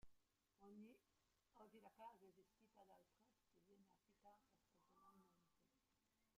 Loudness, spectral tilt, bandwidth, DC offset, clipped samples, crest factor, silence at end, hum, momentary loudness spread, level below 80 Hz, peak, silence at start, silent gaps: -66 LUFS; -5.5 dB/octave; 11.5 kHz; under 0.1%; under 0.1%; 20 dB; 0 s; none; 4 LU; -90 dBFS; -52 dBFS; 0 s; none